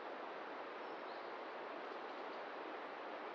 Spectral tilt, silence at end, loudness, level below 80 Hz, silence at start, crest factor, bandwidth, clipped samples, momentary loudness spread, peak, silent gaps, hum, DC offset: -0.5 dB/octave; 0 s; -48 LUFS; under -90 dBFS; 0 s; 12 dB; 7.6 kHz; under 0.1%; 1 LU; -36 dBFS; none; none; under 0.1%